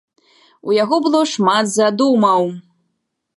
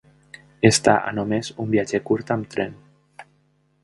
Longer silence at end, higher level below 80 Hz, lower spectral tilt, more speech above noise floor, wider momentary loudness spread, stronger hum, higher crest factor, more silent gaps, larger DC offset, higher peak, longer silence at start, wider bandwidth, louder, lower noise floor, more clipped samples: first, 0.75 s vs 0.6 s; second, -72 dBFS vs -54 dBFS; about the same, -4.5 dB/octave vs -4.5 dB/octave; first, 57 dB vs 43 dB; about the same, 9 LU vs 11 LU; neither; second, 16 dB vs 22 dB; neither; neither; about the same, -2 dBFS vs 0 dBFS; about the same, 0.65 s vs 0.6 s; about the same, 11.5 kHz vs 11.5 kHz; first, -15 LUFS vs -21 LUFS; first, -72 dBFS vs -63 dBFS; neither